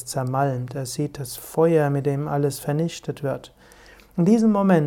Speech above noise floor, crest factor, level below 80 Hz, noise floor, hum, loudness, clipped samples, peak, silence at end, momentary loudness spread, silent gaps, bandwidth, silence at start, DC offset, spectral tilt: 27 dB; 16 dB; -56 dBFS; -49 dBFS; none; -23 LUFS; under 0.1%; -6 dBFS; 0 s; 12 LU; none; 17.5 kHz; 0 s; under 0.1%; -7 dB/octave